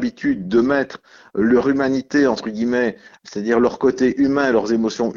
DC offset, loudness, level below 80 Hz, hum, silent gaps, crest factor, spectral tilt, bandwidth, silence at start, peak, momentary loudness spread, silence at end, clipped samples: under 0.1%; -18 LUFS; -52 dBFS; none; none; 14 dB; -6 dB/octave; 7.4 kHz; 0 s; -4 dBFS; 9 LU; 0.05 s; under 0.1%